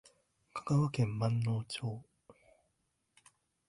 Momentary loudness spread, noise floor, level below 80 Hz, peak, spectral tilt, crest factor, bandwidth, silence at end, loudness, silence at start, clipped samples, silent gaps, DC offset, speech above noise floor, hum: 14 LU; -81 dBFS; -66 dBFS; -18 dBFS; -7 dB/octave; 18 dB; 11.5 kHz; 1.65 s; -35 LUFS; 0.55 s; under 0.1%; none; under 0.1%; 48 dB; none